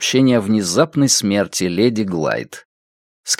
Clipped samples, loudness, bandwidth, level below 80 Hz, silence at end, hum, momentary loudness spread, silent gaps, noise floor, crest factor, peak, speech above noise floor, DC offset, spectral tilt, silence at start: under 0.1%; -16 LUFS; 16.5 kHz; -58 dBFS; 0.05 s; none; 9 LU; 2.65-3.24 s; under -90 dBFS; 16 dB; 0 dBFS; over 74 dB; under 0.1%; -4 dB/octave; 0 s